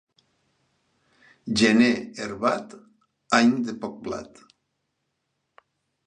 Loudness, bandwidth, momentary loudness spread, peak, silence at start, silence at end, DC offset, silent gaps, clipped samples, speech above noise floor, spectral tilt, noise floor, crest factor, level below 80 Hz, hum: -23 LUFS; 10 kHz; 16 LU; -2 dBFS; 1.45 s; 1.8 s; under 0.1%; none; under 0.1%; 54 dB; -4.5 dB/octave; -77 dBFS; 24 dB; -62 dBFS; none